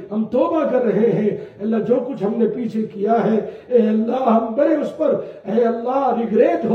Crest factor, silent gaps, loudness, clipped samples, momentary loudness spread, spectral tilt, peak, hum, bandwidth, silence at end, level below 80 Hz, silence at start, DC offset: 14 dB; none; -19 LUFS; under 0.1%; 6 LU; -9 dB/octave; -4 dBFS; none; 6.4 kHz; 0 s; -64 dBFS; 0 s; under 0.1%